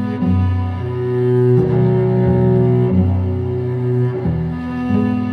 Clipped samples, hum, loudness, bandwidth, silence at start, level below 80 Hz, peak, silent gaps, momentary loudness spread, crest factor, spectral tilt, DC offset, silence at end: under 0.1%; none; -16 LUFS; 4.9 kHz; 0 s; -38 dBFS; -4 dBFS; none; 7 LU; 12 dB; -11 dB/octave; under 0.1%; 0 s